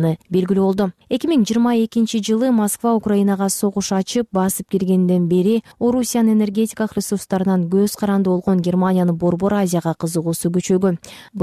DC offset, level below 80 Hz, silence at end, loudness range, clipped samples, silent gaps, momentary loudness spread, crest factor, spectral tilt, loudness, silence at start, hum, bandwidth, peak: under 0.1%; -54 dBFS; 0 s; 1 LU; under 0.1%; none; 5 LU; 10 dB; -6 dB/octave; -18 LUFS; 0 s; none; 15 kHz; -8 dBFS